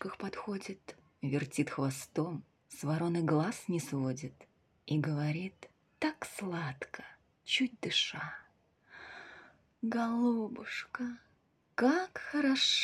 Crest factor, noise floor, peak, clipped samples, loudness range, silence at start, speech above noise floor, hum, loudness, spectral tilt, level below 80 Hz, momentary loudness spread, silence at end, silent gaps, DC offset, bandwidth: 18 dB; -72 dBFS; -18 dBFS; under 0.1%; 3 LU; 0 s; 38 dB; none; -35 LUFS; -4.5 dB/octave; -76 dBFS; 18 LU; 0 s; none; under 0.1%; 14.5 kHz